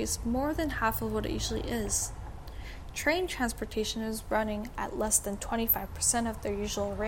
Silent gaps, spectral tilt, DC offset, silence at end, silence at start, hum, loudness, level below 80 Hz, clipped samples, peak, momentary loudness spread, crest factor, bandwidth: none; -3 dB/octave; 0.1%; 0 s; 0 s; none; -31 LUFS; -42 dBFS; under 0.1%; -12 dBFS; 9 LU; 20 dB; 17 kHz